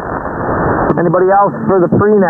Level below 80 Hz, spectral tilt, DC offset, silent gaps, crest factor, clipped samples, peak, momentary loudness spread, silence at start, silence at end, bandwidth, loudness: -34 dBFS; -12 dB/octave; under 0.1%; none; 12 dB; under 0.1%; 0 dBFS; 8 LU; 0 s; 0 s; 2.5 kHz; -12 LUFS